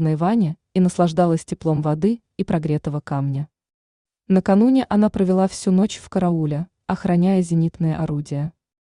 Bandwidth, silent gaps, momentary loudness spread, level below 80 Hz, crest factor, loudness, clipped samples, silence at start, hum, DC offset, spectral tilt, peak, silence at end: 11 kHz; 3.74-4.05 s; 9 LU; -50 dBFS; 14 dB; -20 LUFS; under 0.1%; 0 s; none; under 0.1%; -8 dB/octave; -6 dBFS; 0.35 s